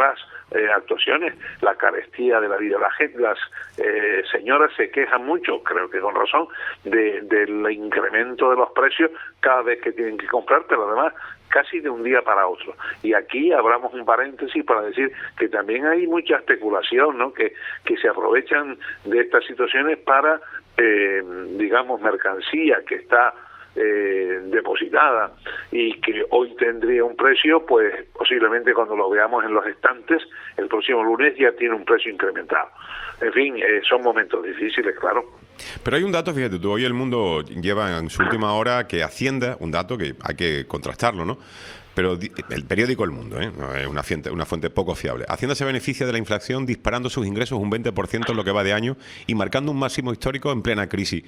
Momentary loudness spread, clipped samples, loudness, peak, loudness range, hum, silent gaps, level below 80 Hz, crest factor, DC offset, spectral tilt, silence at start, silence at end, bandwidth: 10 LU; under 0.1%; -21 LUFS; 0 dBFS; 6 LU; none; none; -50 dBFS; 20 dB; under 0.1%; -5 dB/octave; 0 s; 0.05 s; 13 kHz